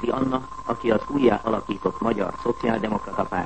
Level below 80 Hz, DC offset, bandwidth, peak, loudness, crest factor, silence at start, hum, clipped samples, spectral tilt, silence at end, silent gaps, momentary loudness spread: -48 dBFS; 0.7%; 8.6 kHz; -6 dBFS; -24 LUFS; 18 dB; 0 s; none; under 0.1%; -7 dB/octave; 0 s; none; 6 LU